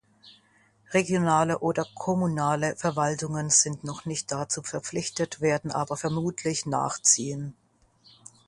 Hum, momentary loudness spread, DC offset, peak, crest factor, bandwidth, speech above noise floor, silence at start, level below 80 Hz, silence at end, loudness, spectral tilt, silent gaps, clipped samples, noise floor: none; 10 LU; under 0.1%; -6 dBFS; 22 dB; 11.5 kHz; 36 dB; 0.25 s; -62 dBFS; 0.95 s; -26 LUFS; -4 dB/octave; none; under 0.1%; -63 dBFS